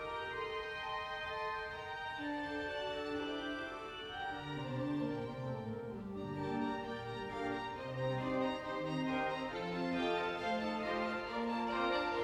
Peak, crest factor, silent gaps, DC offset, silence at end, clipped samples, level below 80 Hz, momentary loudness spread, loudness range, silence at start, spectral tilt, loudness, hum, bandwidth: -24 dBFS; 16 dB; none; under 0.1%; 0 s; under 0.1%; -64 dBFS; 7 LU; 4 LU; 0 s; -6 dB/octave; -39 LUFS; none; 13 kHz